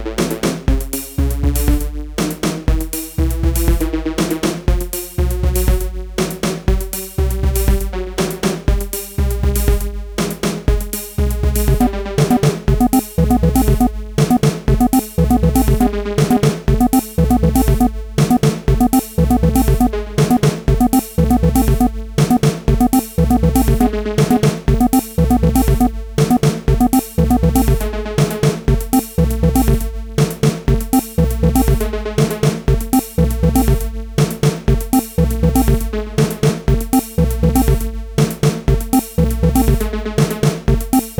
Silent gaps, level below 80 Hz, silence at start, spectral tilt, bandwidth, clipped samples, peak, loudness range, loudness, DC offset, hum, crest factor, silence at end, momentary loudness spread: none; -20 dBFS; 0 s; -6.5 dB/octave; over 20 kHz; under 0.1%; -2 dBFS; 4 LU; -16 LUFS; under 0.1%; none; 14 dB; 0 s; 6 LU